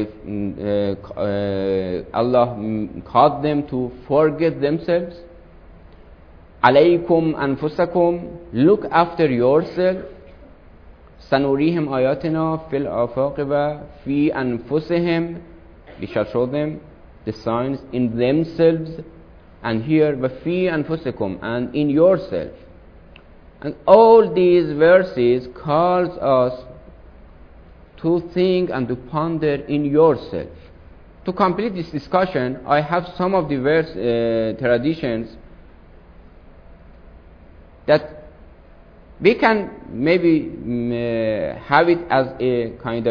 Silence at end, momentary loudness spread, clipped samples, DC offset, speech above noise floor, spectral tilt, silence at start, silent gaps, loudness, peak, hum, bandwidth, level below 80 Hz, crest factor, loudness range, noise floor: 0 s; 12 LU; under 0.1%; under 0.1%; 27 dB; -9 dB/octave; 0 s; none; -19 LUFS; 0 dBFS; none; 5.4 kHz; -46 dBFS; 20 dB; 7 LU; -45 dBFS